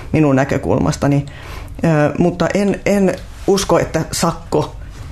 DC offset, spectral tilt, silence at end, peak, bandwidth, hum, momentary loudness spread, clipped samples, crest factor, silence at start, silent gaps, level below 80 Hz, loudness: under 0.1%; -6 dB/octave; 0 s; -2 dBFS; 14 kHz; none; 10 LU; under 0.1%; 14 dB; 0 s; none; -34 dBFS; -16 LUFS